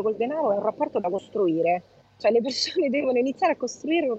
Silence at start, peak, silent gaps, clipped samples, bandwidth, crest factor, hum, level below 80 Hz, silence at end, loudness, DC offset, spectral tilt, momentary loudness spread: 0 s; -10 dBFS; none; under 0.1%; 8.2 kHz; 14 dB; none; -70 dBFS; 0 s; -25 LUFS; under 0.1%; -4.5 dB/octave; 5 LU